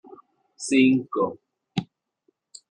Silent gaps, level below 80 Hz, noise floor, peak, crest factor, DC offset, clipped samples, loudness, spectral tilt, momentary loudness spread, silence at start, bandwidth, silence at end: none; -66 dBFS; -71 dBFS; -8 dBFS; 18 dB; under 0.1%; under 0.1%; -23 LUFS; -5 dB/octave; 14 LU; 0.6 s; 10.5 kHz; 0.85 s